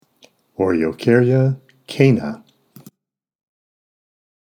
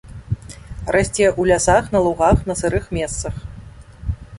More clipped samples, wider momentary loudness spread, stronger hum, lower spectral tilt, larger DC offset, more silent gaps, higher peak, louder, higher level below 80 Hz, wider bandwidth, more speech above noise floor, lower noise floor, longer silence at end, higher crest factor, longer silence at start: neither; about the same, 18 LU vs 16 LU; neither; first, -8 dB/octave vs -5 dB/octave; neither; neither; about the same, 0 dBFS vs -2 dBFS; about the same, -17 LUFS vs -19 LUFS; second, -58 dBFS vs -32 dBFS; about the same, 12.5 kHz vs 11.5 kHz; first, 64 dB vs 21 dB; first, -80 dBFS vs -39 dBFS; first, 2.05 s vs 0 s; about the same, 20 dB vs 18 dB; first, 0.6 s vs 0.05 s